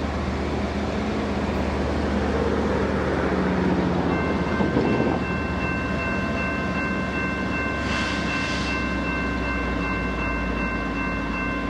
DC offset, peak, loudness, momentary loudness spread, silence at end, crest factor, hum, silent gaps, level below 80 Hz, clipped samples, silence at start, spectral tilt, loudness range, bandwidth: under 0.1%; -8 dBFS; -24 LUFS; 4 LU; 0 s; 16 dB; none; none; -34 dBFS; under 0.1%; 0 s; -6.5 dB/octave; 2 LU; 10.5 kHz